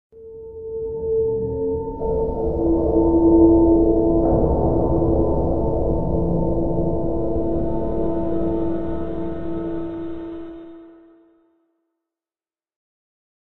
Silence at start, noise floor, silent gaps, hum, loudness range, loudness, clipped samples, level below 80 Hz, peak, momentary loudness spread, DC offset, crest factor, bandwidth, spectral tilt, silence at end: 0.1 s; under -90 dBFS; none; none; 15 LU; -20 LUFS; under 0.1%; -30 dBFS; -2 dBFS; 16 LU; 2%; 18 dB; 2.2 kHz; -13 dB/octave; 0.7 s